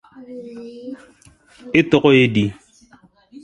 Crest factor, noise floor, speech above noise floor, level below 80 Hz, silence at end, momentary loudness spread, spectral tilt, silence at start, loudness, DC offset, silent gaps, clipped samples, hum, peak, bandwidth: 20 dB; -52 dBFS; 35 dB; -52 dBFS; 0.9 s; 23 LU; -7 dB/octave; 0.2 s; -16 LUFS; under 0.1%; none; under 0.1%; none; 0 dBFS; 11.5 kHz